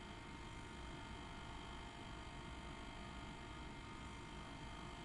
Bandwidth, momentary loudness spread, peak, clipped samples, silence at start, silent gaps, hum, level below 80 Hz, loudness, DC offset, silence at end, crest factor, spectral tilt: 11.5 kHz; 1 LU; -38 dBFS; under 0.1%; 0 s; none; none; -58 dBFS; -53 LUFS; under 0.1%; 0 s; 14 dB; -4.5 dB/octave